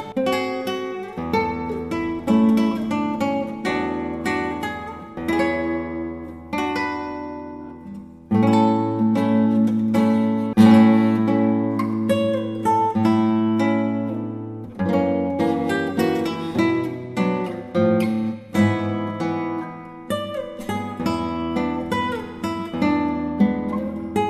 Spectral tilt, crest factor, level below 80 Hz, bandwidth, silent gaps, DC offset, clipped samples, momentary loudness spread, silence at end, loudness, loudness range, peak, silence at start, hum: -7 dB/octave; 20 dB; -54 dBFS; 13 kHz; none; under 0.1%; under 0.1%; 12 LU; 0 s; -21 LUFS; 8 LU; 0 dBFS; 0 s; none